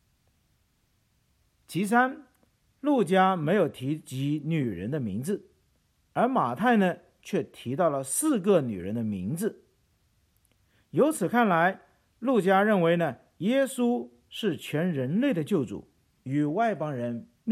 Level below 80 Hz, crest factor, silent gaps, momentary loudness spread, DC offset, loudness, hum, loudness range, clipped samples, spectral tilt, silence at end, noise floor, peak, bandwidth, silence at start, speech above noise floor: -70 dBFS; 20 dB; none; 11 LU; under 0.1%; -27 LUFS; none; 4 LU; under 0.1%; -5.5 dB/octave; 0 s; -70 dBFS; -8 dBFS; 15.5 kHz; 1.7 s; 44 dB